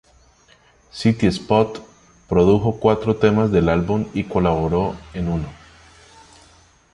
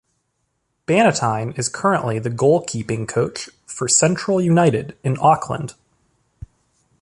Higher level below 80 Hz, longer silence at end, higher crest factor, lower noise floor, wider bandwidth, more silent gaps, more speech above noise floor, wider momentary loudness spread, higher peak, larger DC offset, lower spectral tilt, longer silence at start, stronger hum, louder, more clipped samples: first, -38 dBFS vs -52 dBFS; about the same, 1.4 s vs 1.3 s; about the same, 18 dB vs 18 dB; second, -54 dBFS vs -71 dBFS; about the same, 11.5 kHz vs 11.5 kHz; neither; second, 36 dB vs 53 dB; about the same, 10 LU vs 12 LU; about the same, -2 dBFS vs -2 dBFS; neither; first, -7.5 dB/octave vs -4.5 dB/octave; about the same, 0.95 s vs 0.9 s; neither; about the same, -19 LUFS vs -18 LUFS; neither